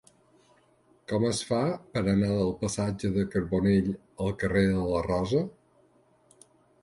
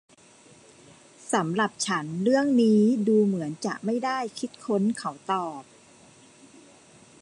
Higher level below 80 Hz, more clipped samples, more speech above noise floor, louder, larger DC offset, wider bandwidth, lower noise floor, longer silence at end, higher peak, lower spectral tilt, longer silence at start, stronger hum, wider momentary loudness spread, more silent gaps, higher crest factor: first, -48 dBFS vs -74 dBFS; neither; first, 37 dB vs 30 dB; second, -28 LUFS vs -25 LUFS; neither; about the same, 11.5 kHz vs 11 kHz; first, -64 dBFS vs -54 dBFS; second, 1.3 s vs 1.6 s; about the same, -12 dBFS vs -10 dBFS; about the same, -6.5 dB/octave vs -5.5 dB/octave; second, 1.1 s vs 1.25 s; neither; second, 8 LU vs 13 LU; neither; about the same, 18 dB vs 16 dB